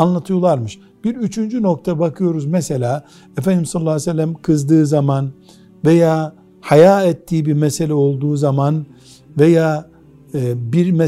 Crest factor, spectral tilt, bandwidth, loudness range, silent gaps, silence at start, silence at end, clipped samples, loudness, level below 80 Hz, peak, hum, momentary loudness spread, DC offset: 16 dB; -7.5 dB/octave; 13.5 kHz; 4 LU; none; 0 s; 0 s; under 0.1%; -16 LUFS; -52 dBFS; 0 dBFS; none; 12 LU; under 0.1%